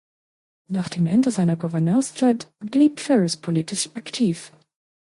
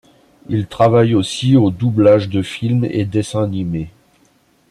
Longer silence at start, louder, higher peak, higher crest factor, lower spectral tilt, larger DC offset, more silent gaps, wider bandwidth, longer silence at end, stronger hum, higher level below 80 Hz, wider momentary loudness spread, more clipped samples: first, 0.7 s vs 0.5 s; second, -22 LUFS vs -16 LUFS; second, -6 dBFS vs -2 dBFS; about the same, 16 dB vs 14 dB; about the same, -6 dB/octave vs -7 dB/octave; neither; neither; about the same, 11.5 kHz vs 11.5 kHz; second, 0.6 s vs 0.8 s; neither; second, -66 dBFS vs -48 dBFS; about the same, 8 LU vs 10 LU; neither